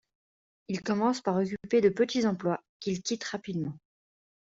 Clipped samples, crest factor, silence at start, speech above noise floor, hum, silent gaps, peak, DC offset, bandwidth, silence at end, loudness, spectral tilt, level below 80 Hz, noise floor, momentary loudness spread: under 0.1%; 18 dB; 0.7 s; over 61 dB; none; 2.69-2.80 s; -12 dBFS; under 0.1%; 7.8 kHz; 0.8 s; -30 LUFS; -5.5 dB/octave; -68 dBFS; under -90 dBFS; 10 LU